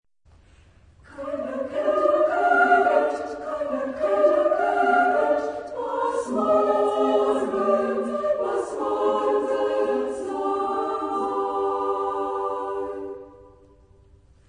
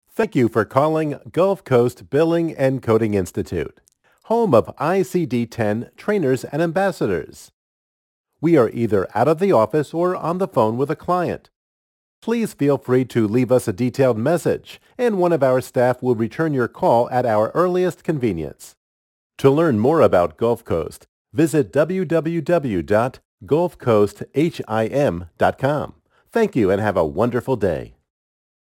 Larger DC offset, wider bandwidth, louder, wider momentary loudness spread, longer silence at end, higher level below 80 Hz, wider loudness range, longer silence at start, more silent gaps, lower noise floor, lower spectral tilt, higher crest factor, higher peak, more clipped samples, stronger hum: neither; second, 10.5 kHz vs 17 kHz; second, -23 LUFS vs -19 LUFS; about the same, 10 LU vs 8 LU; first, 1.05 s vs 0.9 s; second, -60 dBFS vs -52 dBFS; first, 6 LU vs 3 LU; first, 1.1 s vs 0.2 s; second, none vs 7.53-8.24 s, 11.56-12.22 s, 18.77-19.30 s, 21.09-21.25 s, 23.25-23.38 s; second, -56 dBFS vs under -90 dBFS; second, -5 dB/octave vs -7.5 dB/octave; about the same, 18 dB vs 18 dB; second, -6 dBFS vs -2 dBFS; neither; neither